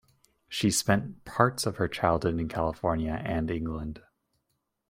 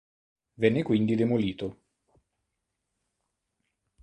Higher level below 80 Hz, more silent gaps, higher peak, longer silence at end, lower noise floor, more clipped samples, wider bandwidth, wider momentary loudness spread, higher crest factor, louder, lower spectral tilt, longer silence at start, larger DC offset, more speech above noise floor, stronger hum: first, -48 dBFS vs -62 dBFS; neither; first, -4 dBFS vs -8 dBFS; second, 0.9 s vs 2.3 s; about the same, -79 dBFS vs -82 dBFS; neither; first, 16.5 kHz vs 8.8 kHz; about the same, 10 LU vs 11 LU; about the same, 26 dB vs 22 dB; about the same, -29 LUFS vs -27 LUFS; second, -5 dB/octave vs -8.5 dB/octave; about the same, 0.5 s vs 0.6 s; neither; second, 51 dB vs 56 dB; neither